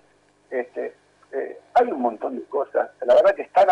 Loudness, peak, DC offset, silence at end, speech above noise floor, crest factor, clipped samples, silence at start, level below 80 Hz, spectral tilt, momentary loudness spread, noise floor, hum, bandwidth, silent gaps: -22 LUFS; -8 dBFS; under 0.1%; 0 s; 39 dB; 14 dB; under 0.1%; 0.5 s; -68 dBFS; -5 dB/octave; 15 LU; -60 dBFS; 50 Hz at -70 dBFS; 8.2 kHz; none